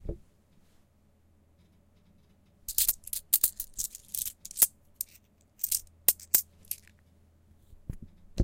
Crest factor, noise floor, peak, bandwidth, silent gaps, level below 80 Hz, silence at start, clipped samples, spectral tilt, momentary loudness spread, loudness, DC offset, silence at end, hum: 30 dB; -65 dBFS; -4 dBFS; 17 kHz; none; -52 dBFS; 0.05 s; under 0.1%; -1.5 dB/octave; 21 LU; -28 LUFS; under 0.1%; 0 s; none